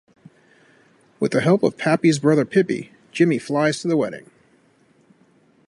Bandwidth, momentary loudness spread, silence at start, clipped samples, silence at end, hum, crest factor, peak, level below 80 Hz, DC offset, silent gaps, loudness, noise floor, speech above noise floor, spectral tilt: 11.5 kHz; 10 LU; 1.2 s; under 0.1%; 1.5 s; none; 18 dB; -4 dBFS; -66 dBFS; under 0.1%; none; -20 LUFS; -58 dBFS; 39 dB; -6 dB/octave